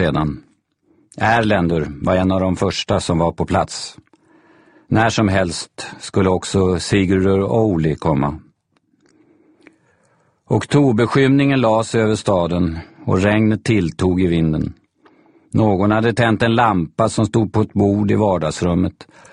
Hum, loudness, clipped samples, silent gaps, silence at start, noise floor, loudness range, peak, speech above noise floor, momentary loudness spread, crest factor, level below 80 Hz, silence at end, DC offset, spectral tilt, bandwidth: none; -17 LUFS; under 0.1%; none; 0 s; -63 dBFS; 4 LU; 0 dBFS; 47 dB; 8 LU; 16 dB; -40 dBFS; 0.3 s; under 0.1%; -6.5 dB/octave; 10.5 kHz